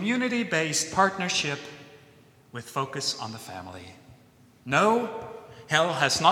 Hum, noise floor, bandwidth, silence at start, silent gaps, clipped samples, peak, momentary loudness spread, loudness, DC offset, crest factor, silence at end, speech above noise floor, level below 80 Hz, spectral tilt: none; -57 dBFS; 17 kHz; 0 s; none; under 0.1%; -6 dBFS; 20 LU; -26 LUFS; under 0.1%; 22 dB; 0 s; 31 dB; -64 dBFS; -3 dB/octave